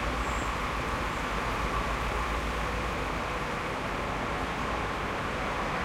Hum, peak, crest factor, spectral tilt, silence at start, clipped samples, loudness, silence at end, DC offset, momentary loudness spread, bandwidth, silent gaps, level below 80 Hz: none; -18 dBFS; 14 dB; -4.5 dB/octave; 0 s; under 0.1%; -31 LUFS; 0 s; under 0.1%; 2 LU; 16 kHz; none; -38 dBFS